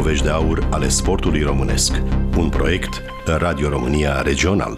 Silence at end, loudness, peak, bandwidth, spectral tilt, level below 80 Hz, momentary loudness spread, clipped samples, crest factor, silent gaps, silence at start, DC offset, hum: 0 s; -19 LUFS; -6 dBFS; 15 kHz; -4.5 dB/octave; -22 dBFS; 3 LU; under 0.1%; 12 dB; none; 0 s; under 0.1%; none